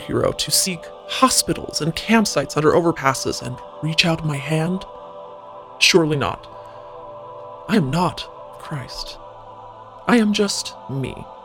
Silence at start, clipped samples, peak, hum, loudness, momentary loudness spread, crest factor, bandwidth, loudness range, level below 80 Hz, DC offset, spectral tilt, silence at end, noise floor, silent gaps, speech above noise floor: 0 s; under 0.1%; 0 dBFS; none; -19 LUFS; 22 LU; 22 dB; 19.5 kHz; 7 LU; -48 dBFS; under 0.1%; -4 dB/octave; 0 s; -39 dBFS; none; 19 dB